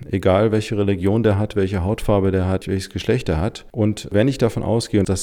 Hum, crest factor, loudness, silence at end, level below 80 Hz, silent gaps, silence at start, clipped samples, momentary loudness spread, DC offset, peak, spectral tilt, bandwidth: none; 14 dB; -20 LUFS; 0 s; -38 dBFS; none; 0 s; under 0.1%; 5 LU; under 0.1%; -4 dBFS; -6.5 dB/octave; 15 kHz